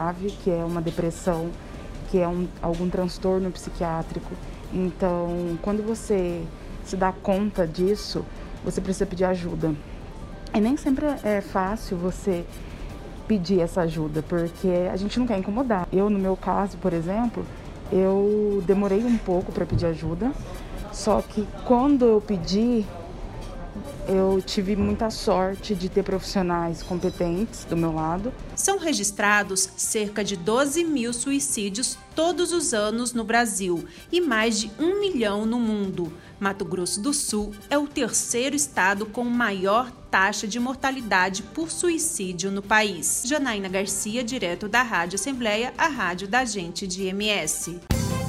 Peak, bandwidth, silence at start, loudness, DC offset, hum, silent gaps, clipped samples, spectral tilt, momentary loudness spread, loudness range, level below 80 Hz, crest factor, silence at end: -4 dBFS; 16 kHz; 0 s; -24 LUFS; under 0.1%; none; none; under 0.1%; -4 dB/octave; 9 LU; 4 LU; -40 dBFS; 20 dB; 0 s